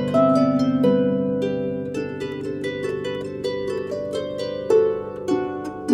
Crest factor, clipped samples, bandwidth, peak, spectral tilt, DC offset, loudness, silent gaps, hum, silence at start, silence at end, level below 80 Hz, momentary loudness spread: 16 dB; under 0.1%; 11 kHz; -6 dBFS; -7 dB/octave; under 0.1%; -23 LUFS; none; none; 0 s; 0 s; -56 dBFS; 10 LU